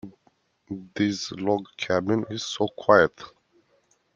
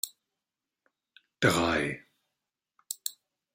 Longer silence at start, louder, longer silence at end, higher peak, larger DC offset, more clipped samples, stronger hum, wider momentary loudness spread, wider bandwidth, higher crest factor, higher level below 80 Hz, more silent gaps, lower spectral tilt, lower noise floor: about the same, 0.05 s vs 0.05 s; first, -24 LUFS vs -30 LUFS; first, 0.85 s vs 0.45 s; first, -2 dBFS vs -10 dBFS; neither; neither; neither; first, 20 LU vs 15 LU; second, 7.6 kHz vs 16 kHz; about the same, 24 dB vs 24 dB; about the same, -64 dBFS vs -62 dBFS; neither; about the same, -5 dB/octave vs -4 dB/octave; second, -66 dBFS vs -89 dBFS